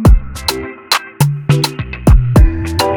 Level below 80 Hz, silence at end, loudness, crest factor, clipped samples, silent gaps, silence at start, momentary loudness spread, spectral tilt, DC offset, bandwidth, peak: -14 dBFS; 0 s; -14 LUFS; 12 dB; under 0.1%; none; 0 s; 8 LU; -5.5 dB/octave; under 0.1%; 19 kHz; 0 dBFS